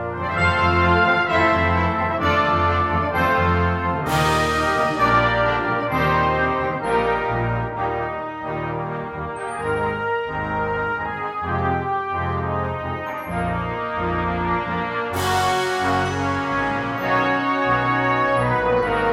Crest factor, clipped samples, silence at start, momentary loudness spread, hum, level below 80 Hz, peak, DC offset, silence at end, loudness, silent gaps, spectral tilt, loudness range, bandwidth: 16 dB; under 0.1%; 0 s; 9 LU; none; -42 dBFS; -4 dBFS; under 0.1%; 0 s; -21 LUFS; none; -6 dB/octave; 6 LU; 16 kHz